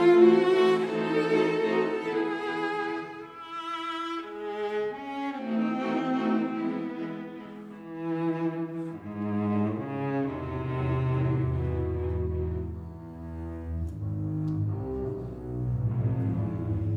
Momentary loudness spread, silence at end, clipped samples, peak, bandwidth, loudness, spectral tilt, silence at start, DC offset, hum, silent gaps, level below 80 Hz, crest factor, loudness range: 12 LU; 0 s; under 0.1%; -8 dBFS; 9.2 kHz; -29 LUFS; -8.5 dB/octave; 0 s; under 0.1%; none; none; -44 dBFS; 20 dB; 4 LU